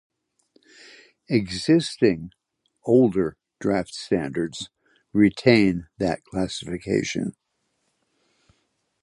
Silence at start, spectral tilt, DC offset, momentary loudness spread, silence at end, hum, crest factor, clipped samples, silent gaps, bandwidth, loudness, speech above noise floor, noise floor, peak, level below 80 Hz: 1.3 s; -6 dB/octave; under 0.1%; 13 LU; 1.7 s; none; 22 dB; under 0.1%; none; 11.5 kHz; -23 LUFS; 51 dB; -73 dBFS; -2 dBFS; -52 dBFS